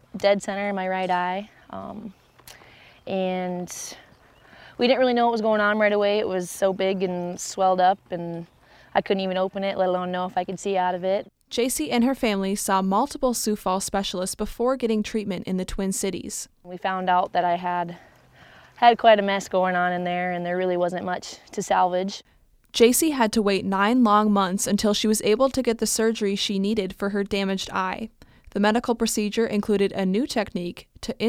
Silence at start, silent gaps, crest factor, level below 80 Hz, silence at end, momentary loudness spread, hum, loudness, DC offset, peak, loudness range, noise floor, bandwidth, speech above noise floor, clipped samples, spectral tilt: 0.15 s; none; 20 dB; -52 dBFS; 0 s; 13 LU; none; -23 LUFS; under 0.1%; -4 dBFS; 6 LU; -53 dBFS; 17 kHz; 30 dB; under 0.1%; -4 dB/octave